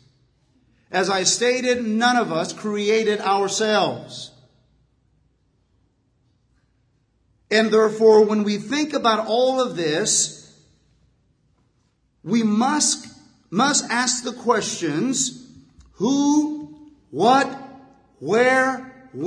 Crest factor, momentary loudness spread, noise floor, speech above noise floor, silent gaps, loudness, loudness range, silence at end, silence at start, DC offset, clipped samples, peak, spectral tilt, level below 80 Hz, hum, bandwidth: 20 dB; 11 LU; -65 dBFS; 46 dB; none; -20 LUFS; 6 LU; 0 s; 0.9 s; under 0.1%; under 0.1%; -2 dBFS; -3 dB/octave; -66 dBFS; none; 10.5 kHz